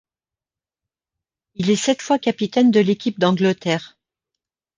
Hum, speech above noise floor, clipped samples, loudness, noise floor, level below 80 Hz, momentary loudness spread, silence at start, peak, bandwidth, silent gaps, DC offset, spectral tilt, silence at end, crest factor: none; over 72 dB; under 0.1%; -19 LUFS; under -90 dBFS; -64 dBFS; 8 LU; 1.6 s; -2 dBFS; 9.8 kHz; none; under 0.1%; -5.5 dB/octave; 0.9 s; 18 dB